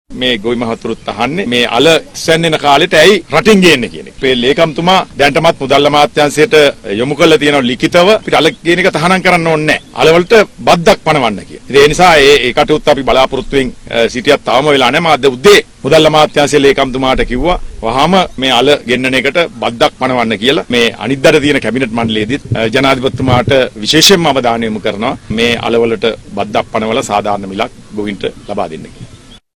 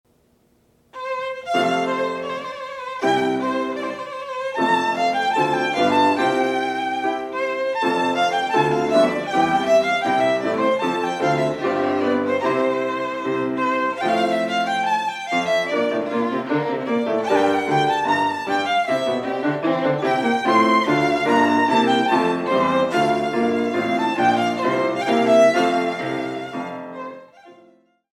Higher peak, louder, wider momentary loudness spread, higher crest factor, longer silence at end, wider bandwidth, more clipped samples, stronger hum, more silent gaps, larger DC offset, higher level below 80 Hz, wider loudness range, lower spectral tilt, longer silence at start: first, 0 dBFS vs -4 dBFS; first, -10 LUFS vs -20 LUFS; about the same, 10 LU vs 9 LU; second, 10 dB vs 16 dB; second, 0.4 s vs 0.6 s; first, over 20 kHz vs 14.5 kHz; first, 0.3% vs under 0.1%; neither; neither; neither; first, -32 dBFS vs -64 dBFS; about the same, 3 LU vs 4 LU; about the same, -4 dB/octave vs -5 dB/octave; second, 0.1 s vs 0.95 s